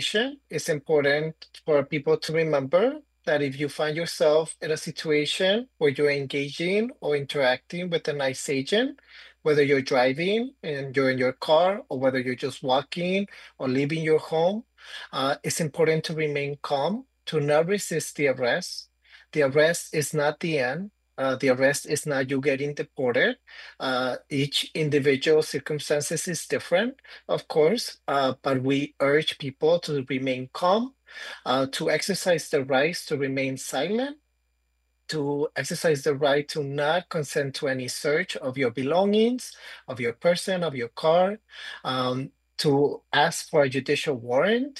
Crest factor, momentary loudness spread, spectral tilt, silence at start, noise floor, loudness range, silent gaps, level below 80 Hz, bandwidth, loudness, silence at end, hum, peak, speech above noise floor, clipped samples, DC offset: 18 dB; 8 LU; -4.5 dB/octave; 0 s; -72 dBFS; 2 LU; none; -70 dBFS; 12.5 kHz; -25 LUFS; 0 s; none; -8 dBFS; 47 dB; under 0.1%; under 0.1%